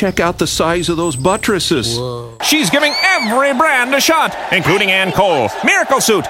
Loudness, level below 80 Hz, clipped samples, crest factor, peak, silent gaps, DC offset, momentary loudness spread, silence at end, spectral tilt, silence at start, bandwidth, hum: -13 LUFS; -40 dBFS; under 0.1%; 12 dB; -2 dBFS; none; under 0.1%; 4 LU; 0 s; -3 dB/octave; 0 s; 17 kHz; none